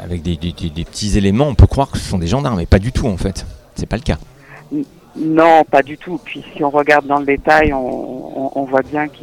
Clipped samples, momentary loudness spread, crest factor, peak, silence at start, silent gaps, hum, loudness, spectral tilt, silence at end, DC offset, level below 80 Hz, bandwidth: 0.2%; 14 LU; 16 dB; 0 dBFS; 0 s; none; none; -16 LUFS; -6.5 dB/octave; 0.15 s; under 0.1%; -26 dBFS; 13.5 kHz